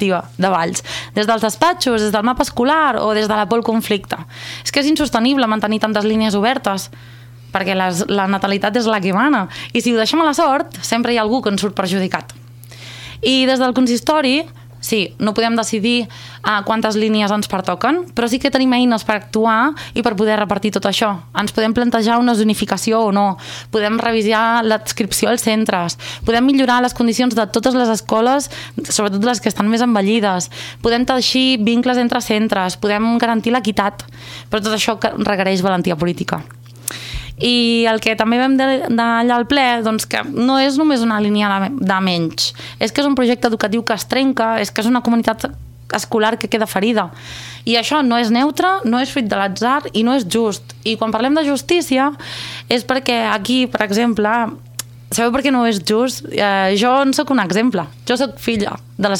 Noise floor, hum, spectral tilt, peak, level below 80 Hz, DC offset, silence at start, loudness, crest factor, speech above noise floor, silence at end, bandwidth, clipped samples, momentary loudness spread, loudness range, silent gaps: -36 dBFS; none; -4 dB/octave; -2 dBFS; -46 dBFS; under 0.1%; 0 s; -16 LUFS; 14 dB; 20 dB; 0 s; 17 kHz; under 0.1%; 8 LU; 2 LU; none